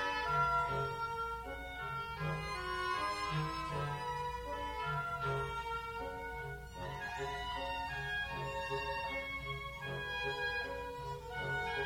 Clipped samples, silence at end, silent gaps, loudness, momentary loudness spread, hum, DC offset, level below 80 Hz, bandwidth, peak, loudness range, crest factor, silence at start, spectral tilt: under 0.1%; 0 s; none; -39 LUFS; 7 LU; none; under 0.1%; -54 dBFS; 16 kHz; -24 dBFS; 3 LU; 16 dB; 0 s; -4.5 dB/octave